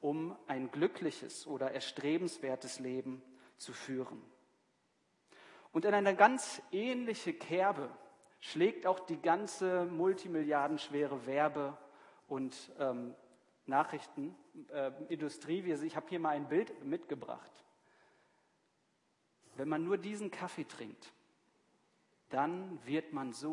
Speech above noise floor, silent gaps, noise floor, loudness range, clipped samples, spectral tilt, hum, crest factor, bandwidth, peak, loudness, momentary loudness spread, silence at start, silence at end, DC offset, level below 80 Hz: 41 dB; none; -78 dBFS; 9 LU; under 0.1%; -5 dB/octave; none; 26 dB; 11 kHz; -12 dBFS; -37 LUFS; 13 LU; 0 s; 0 s; under 0.1%; under -90 dBFS